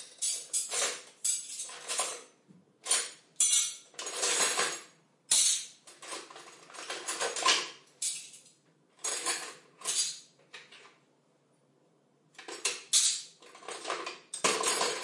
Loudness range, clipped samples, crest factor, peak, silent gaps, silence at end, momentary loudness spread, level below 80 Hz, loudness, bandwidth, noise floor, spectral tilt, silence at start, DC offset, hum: 8 LU; under 0.1%; 24 dB; -12 dBFS; none; 0 s; 21 LU; under -90 dBFS; -30 LUFS; 11.5 kHz; -69 dBFS; 1.5 dB/octave; 0 s; under 0.1%; none